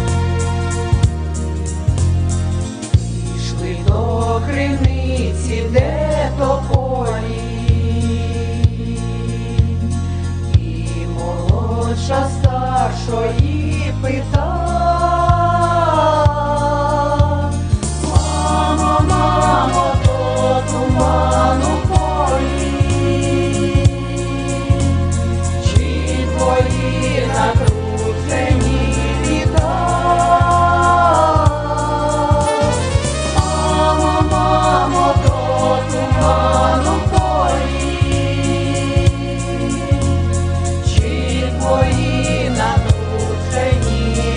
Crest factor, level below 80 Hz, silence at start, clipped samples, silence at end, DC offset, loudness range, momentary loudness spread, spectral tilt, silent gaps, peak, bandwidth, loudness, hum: 14 dB; -22 dBFS; 0 s; under 0.1%; 0 s; under 0.1%; 4 LU; 6 LU; -6 dB/octave; none; -2 dBFS; 10 kHz; -16 LUFS; none